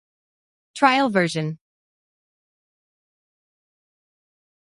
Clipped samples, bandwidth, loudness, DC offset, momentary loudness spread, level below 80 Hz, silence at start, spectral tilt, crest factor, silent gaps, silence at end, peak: under 0.1%; 11.5 kHz; -20 LUFS; under 0.1%; 22 LU; -72 dBFS; 0.75 s; -5 dB/octave; 24 dB; none; 3.2 s; -4 dBFS